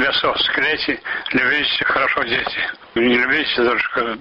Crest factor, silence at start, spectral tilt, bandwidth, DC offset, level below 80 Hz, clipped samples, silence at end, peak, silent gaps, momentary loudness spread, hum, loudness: 12 dB; 0 s; -5.5 dB/octave; 7.2 kHz; under 0.1%; -50 dBFS; under 0.1%; 0 s; -6 dBFS; none; 6 LU; none; -17 LUFS